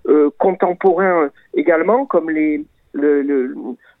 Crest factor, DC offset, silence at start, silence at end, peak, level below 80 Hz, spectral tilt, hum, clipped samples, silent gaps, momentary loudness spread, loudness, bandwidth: 14 dB; under 0.1%; 0.05 s; 0.25 s; -2 dBFS; -60 dBFS; -10 dB/octave; none; under 0.1%; none; 11 LU; -16 LUFS; 4 kHz